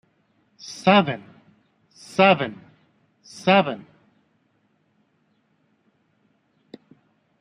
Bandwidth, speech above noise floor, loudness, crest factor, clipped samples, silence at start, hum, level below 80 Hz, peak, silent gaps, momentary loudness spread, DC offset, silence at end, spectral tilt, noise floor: 11 kHz; 47 dB; -20 LUFS; 24 dB; under 0.1%; 0.65 s; none; -70 dBFS; -2 dBFS; none; 21 LU; under 0.1%; 3.6 s; -5.5 dB/octave; -67 dBFS